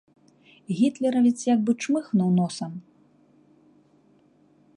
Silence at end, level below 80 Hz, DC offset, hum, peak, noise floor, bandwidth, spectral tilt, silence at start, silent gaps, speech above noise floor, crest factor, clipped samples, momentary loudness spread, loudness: 1.95 s; -74 dBFS; under 0.1%; 50 Hz at -70 dBFS; -10 dBFS; -60 dBFS; 11 kHz; -6.5 dB/octave; 0.7 s; none; 37 dB; 16 dB; under 0.1%; 12 LU; -24 LUFS